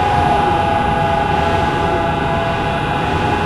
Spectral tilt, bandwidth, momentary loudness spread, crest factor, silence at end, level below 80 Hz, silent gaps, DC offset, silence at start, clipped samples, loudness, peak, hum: -6.5 dB/octave; 13 kHz; 3 LU; 12 dB; 0 s; -30 dBFS; none; under 0.1%; 0 s; under 0.1%; -16 LUFS; -2 dBFS; none